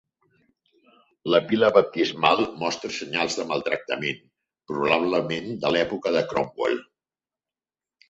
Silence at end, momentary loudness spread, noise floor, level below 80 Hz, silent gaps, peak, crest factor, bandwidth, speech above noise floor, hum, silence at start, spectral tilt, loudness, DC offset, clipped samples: 1.3 s; 10 LU; under -90 dBFS; -62 dBFS; none; -2 dBFS; 22 dB; 8 kHz; over 67 dB; none; 1.25 s; -4.5 dB/octave; -24 LUFS; under 0.1%; under 0.1%